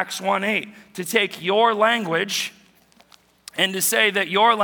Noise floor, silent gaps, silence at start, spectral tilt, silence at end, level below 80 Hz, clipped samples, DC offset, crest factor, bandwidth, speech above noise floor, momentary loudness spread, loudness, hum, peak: -55 dBFS; none; 0 s; -2 dB/octave; 0 s; -74 dBFS; under 0.1%; under 0.1%; 20 dB; 19.5 kHz; 35 dB; 11 LU; -20 LUFS; none; -2 dBFS